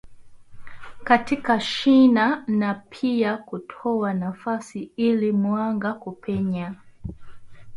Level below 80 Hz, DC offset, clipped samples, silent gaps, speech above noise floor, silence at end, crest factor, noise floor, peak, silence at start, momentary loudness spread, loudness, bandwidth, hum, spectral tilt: -54 dBFS; under 0.1%; under 0.1%; none; 20 dB; 0 s; 18 dB; -42 dBFS; -4 dBFS; 0.05 s; 18 LU; -22 LUFS; 11.5 kHz; none; -6.5 dB/octave